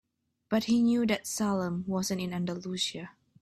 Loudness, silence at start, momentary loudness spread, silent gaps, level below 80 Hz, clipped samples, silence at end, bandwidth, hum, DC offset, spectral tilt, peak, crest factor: -30 LUFS; 0.5 s; 9 LU; none; -66 dBFS; under 0.1%; 0.3 s; 14 kHz; none; under 0.1%; -4.5 dB/octave; -14 dBFS; 16 dB